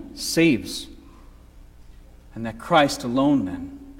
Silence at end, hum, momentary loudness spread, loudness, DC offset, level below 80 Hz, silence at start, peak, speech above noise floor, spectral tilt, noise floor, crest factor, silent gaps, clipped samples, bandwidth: 0 s; 60 Hz at -50 dBFS; 16 LU; -22 LUFS; under 0.1%; -48 dBFS; 0 s; -4 dBFS; 25 dB; -4.5 dB/octave; -47 dBFS; 20 dB; none; under 0.1%; 16.5 kHz